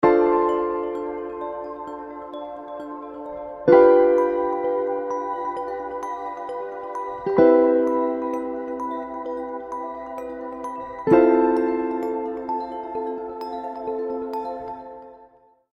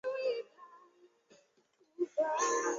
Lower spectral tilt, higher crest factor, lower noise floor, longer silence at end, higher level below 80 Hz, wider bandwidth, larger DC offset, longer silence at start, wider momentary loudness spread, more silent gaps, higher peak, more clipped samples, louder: first, -8 dB/octave vs -0.5 dB/octave; about the same, 20 dB vs 18 dB; second, -54 dBFS vs -72 dBFS; first, 0.5 s vs 0 s; first, -56 dBFS vs -90 dBFS; second, 6.6 kHz vs 7.6 kHz; neither; about the same, 0 s vs 0.05 s; second, 18 LU vs 24 LU; neither; first, -2 dBFS vs -20 dBFS; neither; first, -23 LUFS vs -35 LUFS